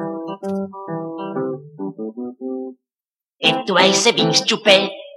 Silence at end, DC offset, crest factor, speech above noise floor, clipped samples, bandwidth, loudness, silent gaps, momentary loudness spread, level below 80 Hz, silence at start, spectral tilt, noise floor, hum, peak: 0 s; under 0.1%; 20 dB; over 75 dB; under 0.1%; 13 kHz; -17 LUFS; none; 16 LU; -68 dBFS; 0 s; -3 dB/octave; under -90 dBFS; none; 0 dBFS